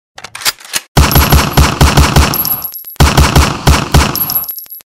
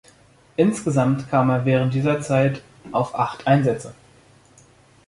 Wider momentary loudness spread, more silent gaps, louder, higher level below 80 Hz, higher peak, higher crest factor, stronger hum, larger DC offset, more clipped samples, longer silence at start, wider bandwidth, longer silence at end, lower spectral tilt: about the same, 8 LU vs 10 LU; first, 0.88-0.95 s vs none; first, -10 LUFS vs -21 LUFS; first, -14 dBFS vs -56 dBFS; first, 0 dBFS vs -4 dBFS; second, 10 dB vs 18 dB; neither; neither; neither; second, 0.35 s vs 0.6 s; first, 16.5 kHz vs 11.5 kHz; second, 0.05 s vs 1.15 s; second, -4 dB/octave vs -7 dB/octave